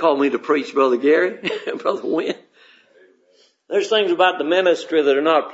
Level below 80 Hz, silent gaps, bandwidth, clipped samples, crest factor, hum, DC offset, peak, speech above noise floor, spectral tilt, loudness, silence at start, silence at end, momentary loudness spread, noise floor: -78 dBFS; none; 8 kHz; under 0.1%; 16 dB; none; under 0.1%; -2 dBFS; 40 dB; -4 dB/octave; -19 LUFS; 0 s; 0 s; 8 LU; -58 dBFS